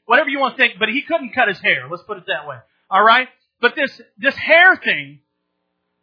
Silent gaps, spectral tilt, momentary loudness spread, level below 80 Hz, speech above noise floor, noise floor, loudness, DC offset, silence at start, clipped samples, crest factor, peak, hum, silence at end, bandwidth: none; -5.5 dB/octave; 15 LU; -70 dBFS; 56 dB; -73 dBFS; -16 LUFS; under 0.1%; 0.1 s; under 0.1%; 18 dB; 0 dBFS; none; 0.9 s; 5.4 kHz